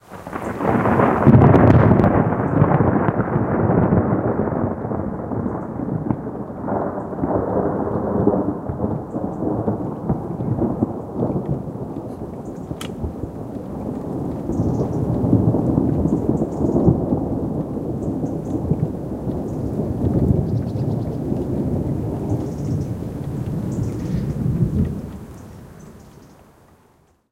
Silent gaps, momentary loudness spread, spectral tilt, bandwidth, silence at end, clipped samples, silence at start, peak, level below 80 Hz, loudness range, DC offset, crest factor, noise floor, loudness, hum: none; 13 LU; -9.5 dB/octave; 12.5 kHz; 1.05 s; under 0.1%; 0.1 s; 0 dBFS; -36 dBFS; 10 LU; under 0.1%; 20 dB; -57 dBFS; -21 LUFS; none